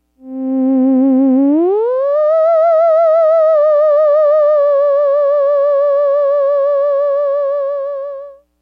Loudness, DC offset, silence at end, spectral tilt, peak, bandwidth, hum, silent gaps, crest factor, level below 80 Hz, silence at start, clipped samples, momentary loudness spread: -12 LUFS; under 0.1%; 0.3 s; -8 dB/octave; -6 dBFS; 4.8 kHz; none; none; 6 dB; -64 dBFS; 0.25 s; under 0.1%; 9 LU